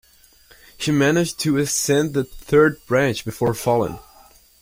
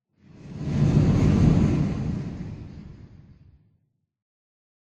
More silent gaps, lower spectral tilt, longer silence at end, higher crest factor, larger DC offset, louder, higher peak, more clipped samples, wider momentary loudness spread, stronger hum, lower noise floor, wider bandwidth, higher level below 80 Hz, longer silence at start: neither; second, -4.5 dB/octave vs -8.5 dB/octave; second, 0.6 s vs 1.9 s; about the same, 18 dB vs 18 dB; neither; about the same, -20 LUFS vs -22 LUFS; about the same, -4 dBFS vs -6 dBFS; neither; second, 9 LU vs 22 LU; neither; second, -52 dBFS vs -70 dBFS; first, 16.5 kHz vs 7.8 kHz; second, -50 dBFS vs -36 dBFS; first, 0.8 s vs 0.45 s